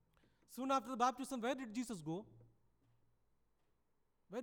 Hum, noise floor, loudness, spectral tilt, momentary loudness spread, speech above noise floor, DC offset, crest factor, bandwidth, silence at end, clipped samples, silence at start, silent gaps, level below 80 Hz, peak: none; -79 dBFS; -41 LUFS; -4.5 dB/octave; 11 LU; 38 dB; under 0.1%; 20 dB; 19.5 kHz; 0 s; under 0.1%; 0.5 s; none; -80 dBFS; -24 dBFS